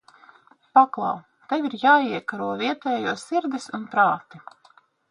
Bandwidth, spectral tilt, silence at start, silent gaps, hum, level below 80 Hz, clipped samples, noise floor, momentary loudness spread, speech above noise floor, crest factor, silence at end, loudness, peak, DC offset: 11 kHz; -4.5 dB/octave; 0.75 s; none; none; -74 dBFS; under 0.1%; -58 dBFS; 11 LU; 35 dB; 22 dB; 0.7 s; -23 LUFS; -2 dBFS; under 0.1%